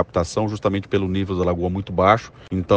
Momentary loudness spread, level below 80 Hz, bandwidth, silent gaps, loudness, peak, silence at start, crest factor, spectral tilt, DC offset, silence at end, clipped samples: 7 LU; -48 dBFS; 9.4 kHz; none; -21 LUFS; 0 dBFS; 0 s; 20 dB; -6.5 dB/octave; under 0.1%; 0 s; under 0.1%